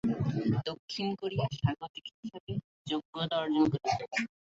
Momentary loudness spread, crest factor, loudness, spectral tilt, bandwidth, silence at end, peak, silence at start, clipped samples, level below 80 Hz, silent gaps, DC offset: 12 LU; 18 dB; -33 LUFS; -6.5 dB/octave; 8 kHz; 0.2 s; -16 dBFS; 0.05 s; under 0.1%; -58 dBFS; 0.79-0.88 s, 1.89-1.94 s, 2.14-2.23 s, 2.40-2.47 s, 2.64-2.85 s, 3.05-3.13 s; under 0.1%